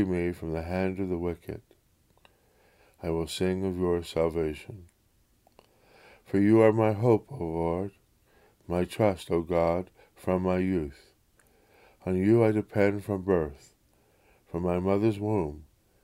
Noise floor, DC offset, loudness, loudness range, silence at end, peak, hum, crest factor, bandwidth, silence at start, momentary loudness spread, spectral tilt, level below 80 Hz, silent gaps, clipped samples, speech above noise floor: -67 dBFS; under 0.1%; -28 LUFS; 6 LU; 0.4 s; -8 dBFS; none; 22 dB; 15.5 kHz; 0 s; 16 LU; -7.5 dB/octave; -52 dBFS; none; under 0.1%; 40 dB